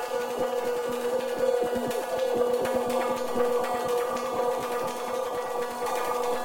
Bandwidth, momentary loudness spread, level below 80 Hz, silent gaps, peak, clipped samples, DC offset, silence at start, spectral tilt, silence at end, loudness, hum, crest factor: 17 kHz; 5 LU; -62 dBFS; none; -12 dBFS; under 0.1%; under 0.1%; 0 s; -3.5 dB/octave; 0 s; -28 LUFS; none; 16 dB